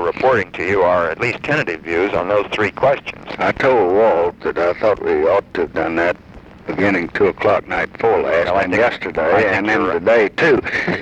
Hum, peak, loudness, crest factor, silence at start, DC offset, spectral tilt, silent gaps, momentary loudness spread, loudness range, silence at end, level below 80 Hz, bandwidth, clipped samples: none; -2 dBFS; -16 LUFS; 14 dB; 0 s; under 0.1%; -6 dB/octave; none; 6 LU; 2 LU; 0 s; -46 dBFS; 8.6 kHz; under 0.1%